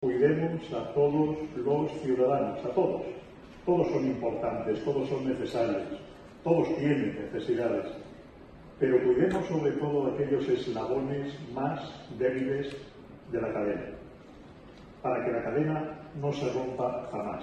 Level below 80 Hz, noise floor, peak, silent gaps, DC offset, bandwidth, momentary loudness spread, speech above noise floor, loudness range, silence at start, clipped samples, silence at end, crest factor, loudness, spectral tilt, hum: -58 dBFS; -50 dBFS; -12 dBFS; none; under 0.1%; 9 kHz; 18 LU; 21 dB; 5 LU; 0 s; under 0.1%; 0 s; 18 dB; -30 LUFS; -8 dB/octave; none